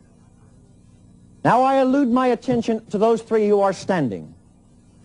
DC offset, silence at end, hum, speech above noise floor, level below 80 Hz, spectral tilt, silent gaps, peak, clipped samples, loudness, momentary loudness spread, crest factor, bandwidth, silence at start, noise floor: under 0.1%; 0.75 s; none; 33 dB; -56 dBFS; -6.5 dB/octave; none; -4 dBFS; under 0.1%; -19 LUFS; 7 LU; 16 dB; 10.5 kHz; 1.45 s; -52 dBFS